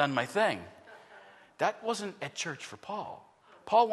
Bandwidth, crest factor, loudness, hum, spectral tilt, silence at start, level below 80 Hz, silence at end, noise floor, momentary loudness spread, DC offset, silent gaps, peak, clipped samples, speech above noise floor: 12.5 kHz; 20 dB; -33 LUFS; none; -3.5 dB/octave; 0 s; -78 dBFS; 0 s; -55 dBFS; 24 LU; under 0.1%; none; -12 dBFS; under 0.1%; 23 dB